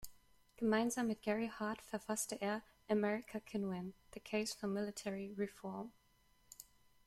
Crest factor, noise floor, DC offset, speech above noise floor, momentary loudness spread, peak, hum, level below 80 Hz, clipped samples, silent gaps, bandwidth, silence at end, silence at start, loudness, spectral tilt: 20 dB; -72 dBFS; under 0.1%; 32 dB; 18 LU; -22 dBFS; none; -72 dBFS; under 0.1%; none; 15.5 kHz; 0.45 s; 0 s; -41 LUFS; -4.5 dB/octave